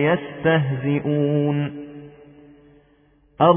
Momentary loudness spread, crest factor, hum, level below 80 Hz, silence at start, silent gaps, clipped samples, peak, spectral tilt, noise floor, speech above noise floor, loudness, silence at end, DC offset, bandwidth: 17 LU; 20 dB; none; -58 dBFS; 0 s; none; under 0.1%; -2 dBFS; -11.5 dB/octave; -57 dBFS; 37 dB; -21 LUFS; 0 s; under 0.1%; 3.6 kHz